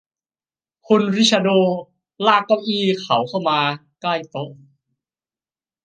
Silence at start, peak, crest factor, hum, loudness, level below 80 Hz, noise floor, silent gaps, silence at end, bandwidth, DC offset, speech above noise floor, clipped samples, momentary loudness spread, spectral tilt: 0.9 s; 0 dBFS; 20 dB; none; -18 LUFS; -70 dBFS; under -90 dBFS; none; 1.3 s; 9.6 kHz; under 0.1%; over 72 dB; under 0.1%; 12 LU; -4.5 dB/octave